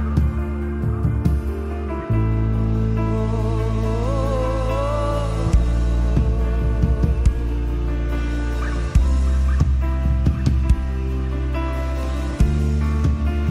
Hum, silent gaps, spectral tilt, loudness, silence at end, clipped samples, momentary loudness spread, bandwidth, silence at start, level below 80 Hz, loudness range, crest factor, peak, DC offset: none; none; -8 dB/octave; -21 LUFS; 0 s; under 0.1%; 5 LU; 10 kHz; 0 s; -20 dBFS; 1 LU; 14 dB; -4 dBFS; under 0.1%